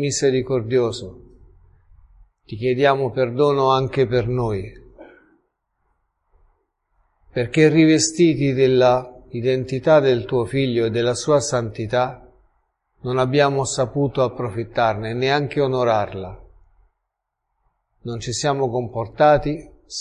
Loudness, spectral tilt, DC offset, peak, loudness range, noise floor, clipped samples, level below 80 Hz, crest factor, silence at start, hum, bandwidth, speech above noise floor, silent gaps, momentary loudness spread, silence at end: -19 LUFS; -5.5 dB/octave; under 0.1%; -2 dBFS; 8 LU; -78 dBFS; under 0.1%; -48 dBFS; 18 dB; 0 s; none; 11 kHz; 60 dB; none; 14 LU; 0 s